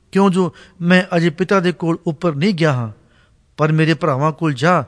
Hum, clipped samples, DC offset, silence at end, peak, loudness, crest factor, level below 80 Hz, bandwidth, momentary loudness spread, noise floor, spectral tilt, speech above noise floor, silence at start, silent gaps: none; under 0.1%; under 0.1%; 0 s; -2 dBFS; -17 LUFS; 16 dB; -56 dBFS; 10.5 kHz; 6 LU; -54 dBFS; -7 dB/octave; 38 dB; 0.15 s; none